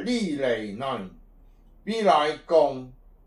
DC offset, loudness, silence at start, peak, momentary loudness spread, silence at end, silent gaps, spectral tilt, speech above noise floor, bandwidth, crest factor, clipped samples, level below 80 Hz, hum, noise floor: under 0.1%; -25 LUFS; 0 s; -8 dBFS; 16 LU; 0.35 s; none; -5 dB/octave; 28 dB; 11.5 kHz; 18 dB; under 0.1%; -54 dBFS; none; -53 dBFS